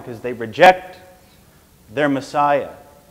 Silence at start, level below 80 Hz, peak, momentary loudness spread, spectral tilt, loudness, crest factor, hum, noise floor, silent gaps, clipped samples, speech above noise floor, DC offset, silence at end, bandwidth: 0 s; -54 dBFS; 0 dBFS; 17 LU; -5 dB/octave; -17 LUFS; 20 dB; none; -50 dBFS; none; under 0.1%; 33 dB; under 0.1%; 0.4 s; 16 kHz